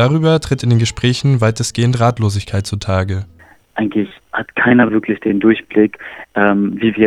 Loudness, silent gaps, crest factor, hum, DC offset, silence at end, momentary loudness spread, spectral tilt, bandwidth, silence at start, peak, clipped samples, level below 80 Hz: -15 LUFS; none; 14 dB; none; under 0.1%; 0 s; 10 LU; -6 dB/octave; 12.5 kHz; 0 s; 0 dBFS; under 0.1%; -42 dBFS